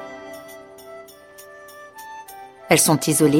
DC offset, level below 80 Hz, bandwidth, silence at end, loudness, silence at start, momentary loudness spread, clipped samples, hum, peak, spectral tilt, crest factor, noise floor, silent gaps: under 0.1%; -60 dBFS; 17 kHz; 0 s; -17 LUFS; 0 s; 26 LU; under 0.1%; none; 0 dBFS; -4 dB/octave; 22 dB; -44 dBFS; none